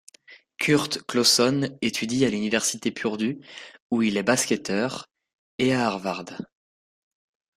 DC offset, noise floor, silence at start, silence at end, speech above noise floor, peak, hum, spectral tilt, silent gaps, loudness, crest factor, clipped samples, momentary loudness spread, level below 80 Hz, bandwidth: under 0.1%; -53 dBFS; 0.3 s; 1.15 s; 29 dB; -6 dBFS; none; -3.5 dB/octave; 3.80-3.90 s, 5.33-5.58 s; -24 LUFS; 20 dB; under 0.1%; 18 LU; -64 dBFS; 15.5 kHz